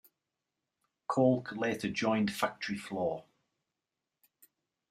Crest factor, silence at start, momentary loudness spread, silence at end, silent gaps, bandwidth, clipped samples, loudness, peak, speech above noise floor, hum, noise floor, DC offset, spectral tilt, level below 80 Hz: 22 dB; 1.1 s; 10 LU; 1.7 s; none; 15.5 kHz; under 0.1%; -32 LUFS; -14 dBFS; 57 dB; none; -89 dBFS; under 0.1%; -5.5 dB/octave; -72 dBFS